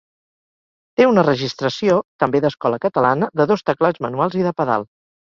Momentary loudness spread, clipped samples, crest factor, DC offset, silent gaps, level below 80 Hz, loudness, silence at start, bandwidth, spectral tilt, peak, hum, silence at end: 6 LU; under 0.1%; 16 dB; under 0.1%; 2.05-2.19 s; -58 dBFS; -18 LUFS; 1 s; 7.4 kHz; -6.5 dB/octave; -2 dBFS; none; 0.4 s